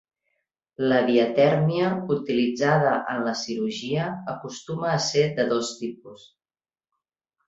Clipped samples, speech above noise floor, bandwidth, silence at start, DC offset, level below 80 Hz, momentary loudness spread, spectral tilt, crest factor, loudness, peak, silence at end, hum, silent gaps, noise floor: under 0.1%; over 66 dB; 8 kHz; 0.8 s; under 0.1%; -66 dBFS; 13 LU; -5.5 dB/octave; 20 dB; -24 LUFS; -6 dBFS; 1.3 s; none; none; under -90 dBFS